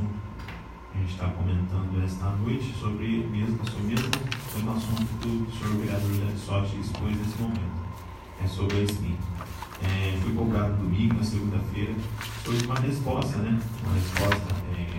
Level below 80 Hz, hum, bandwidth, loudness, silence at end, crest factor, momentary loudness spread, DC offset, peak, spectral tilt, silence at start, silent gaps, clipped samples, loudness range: -44 dBFS; none; 16 kHz; -29 LUFS; 0 s; 20 dB; 8 LU; under 0.1%; -6 dBFS; -6.5 dB/octave; 0 s; none; under 0.1%; 3 LU